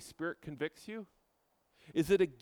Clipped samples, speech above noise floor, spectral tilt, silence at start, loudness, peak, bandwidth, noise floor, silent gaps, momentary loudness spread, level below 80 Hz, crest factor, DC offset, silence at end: under 0.1%; 42 dB; -6 dB/octave; 0 s; -36 LUFS; -18 dBFS; 17.5 kHz; -77 dBFS; none; 17 LU; -64 dBFS; 20 dB; under 0.1%; 0.1 s